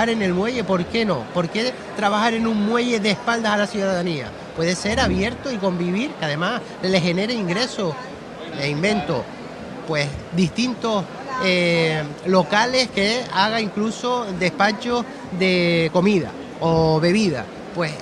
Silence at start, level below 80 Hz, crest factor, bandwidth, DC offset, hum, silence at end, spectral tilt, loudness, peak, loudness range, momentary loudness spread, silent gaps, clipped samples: 0 s; -46 dBFS; 18 dB; 11.5 kHz; under 0.1%; none; 0 s; -5 dB/octave; -21 LUFS; -2 dBFS; 4 LU; 8 LU; none; under 0.1%